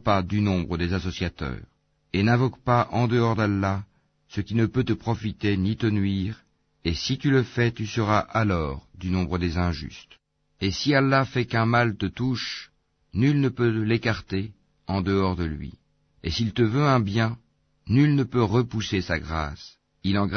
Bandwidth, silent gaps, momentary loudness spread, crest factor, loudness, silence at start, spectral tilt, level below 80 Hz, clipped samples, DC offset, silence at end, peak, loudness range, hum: 6.6 kHz; none; 12 LU; 16 dB; -25 LUFS; 0.05 s; -7 dB/octave; -44 dBFS; under 0.1%; under 0.1%; 0 s; -8 dBFS; 3 LU; none